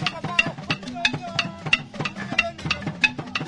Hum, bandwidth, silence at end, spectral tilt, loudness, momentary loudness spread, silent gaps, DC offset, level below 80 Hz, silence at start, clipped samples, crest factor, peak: none; 10.5 kHz; 0 s; -3.5 dB/octave; -24 LUFS; 7 LU; none; under 0.1%; -50 dBFS; 0 s; under 0.1%; 24 dB; -2 dBFS